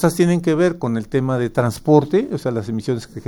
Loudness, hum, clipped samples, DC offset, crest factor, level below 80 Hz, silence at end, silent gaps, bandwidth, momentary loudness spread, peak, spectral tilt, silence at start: -19 LUFS; none; under 0.1%; under 0.1%; 16 dB; -48 dBFS; 0.05 s; none; 17.5 kHz; 8 LU; -2 dBFS; -7 dB/octave; 0 s